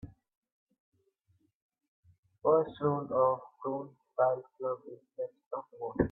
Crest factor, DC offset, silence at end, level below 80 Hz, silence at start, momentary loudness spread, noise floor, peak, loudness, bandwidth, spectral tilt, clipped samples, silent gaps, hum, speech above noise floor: 22 dB; under 0.1%; 0 s; -60 dBFS; 0.05 s; 14 LU; -74 dBFS; -12 dBFS; -33 LUFS; 4 kHz; -11 dB/octave; under 0.1%; 0.37-0.42 s, 0.52-0.67 s, 0.80-0.92 s, 1.55-1.69 s, 1.88-2.03 s, 2.18-2.23 s, 5.46-5.51 s; none; 42 dB